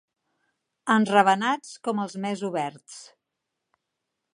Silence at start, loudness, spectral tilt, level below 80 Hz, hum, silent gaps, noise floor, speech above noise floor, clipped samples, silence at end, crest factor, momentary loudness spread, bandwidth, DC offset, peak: 0.85 s; -24 LUFS; -5 dB/octave; -80 dBFS; none; none; -83 dBFS; 58 dB; under 0.1%; 1.3 s; 24 dB; 21 LU; 11.5 kHz; under 0.1%; -2 dBFS